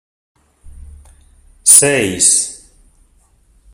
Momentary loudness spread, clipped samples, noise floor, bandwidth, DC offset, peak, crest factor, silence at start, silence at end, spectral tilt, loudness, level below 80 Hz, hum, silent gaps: 9 LU; 0.3%; -53 dBFS; over 20 kHz; under 0.1%; 0 dBFS; 18 dB; 0.65 s; 1.15 s; -1.5 dB/octave; -9 LUFS; -44 dBFS; none; none